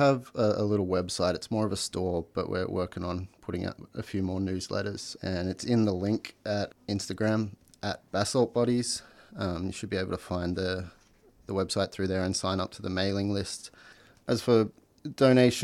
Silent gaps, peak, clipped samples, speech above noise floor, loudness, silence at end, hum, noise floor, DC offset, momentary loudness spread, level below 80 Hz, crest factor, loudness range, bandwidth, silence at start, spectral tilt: none; -10 dBFS; under 0.1%; 32 dB; -30 LUFS; 0 s; none; -60 dBFS; under 0.1%; 11 LU; -58 dBFS; 20 dB; 3 LU; 15 kHz; 0 s; -5.5 dB/octave